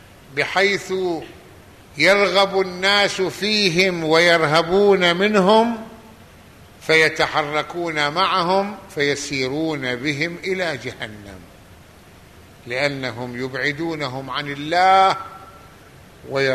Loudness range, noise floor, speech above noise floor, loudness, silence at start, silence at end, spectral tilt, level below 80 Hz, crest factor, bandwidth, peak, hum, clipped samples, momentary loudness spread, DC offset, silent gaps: 10 LU; -46 dBFS; 27 dB; -18 LUFS; 0.3 s; 0 s; -4 dB/octave; -54 dBFS; 18 dB; 13.5 kHz; -2 dBFS; none; under 0.1%; 14 LU; under 0.1%; none